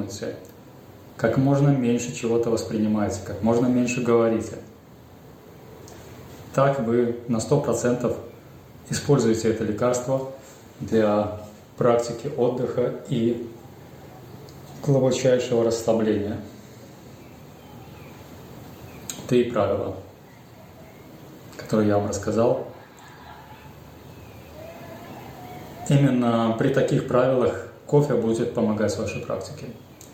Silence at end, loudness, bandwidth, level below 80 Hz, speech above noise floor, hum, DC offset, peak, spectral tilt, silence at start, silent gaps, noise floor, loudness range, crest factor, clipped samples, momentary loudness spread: 0 s; -23 LUFS; 16.5 kHz; -58 dBFS; 25 dB; none; under 0.1%; -6 dBFS; -6.5 dB/octave; 0 s; none; -47 dBFS; 6 LU; 20 dB; under 0.1%; 24 LU